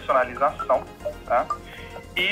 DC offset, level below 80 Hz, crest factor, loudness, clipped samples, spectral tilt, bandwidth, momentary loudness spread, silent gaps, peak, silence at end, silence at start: under 0.1%; -48 dBFS; 16 dB; -25 LUFS; under 0.1%; -4 dB/octave; 16 kHz; 13 LU; none; -10 dBFS; 0 s; 0 s